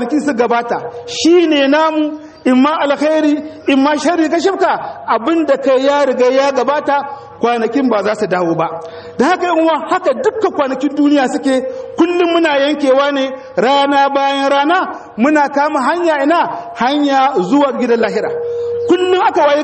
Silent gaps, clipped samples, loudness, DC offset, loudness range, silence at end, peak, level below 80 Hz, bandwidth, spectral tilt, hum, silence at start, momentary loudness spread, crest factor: none; under 0.1%; -13 LUFS; under 0.1%; 2 LU; 0 s; 0 dBFS; -58 dBFS; 8.8 kHz; -4.5 dB/octave; none; 0 s; 7 LU; 12 dB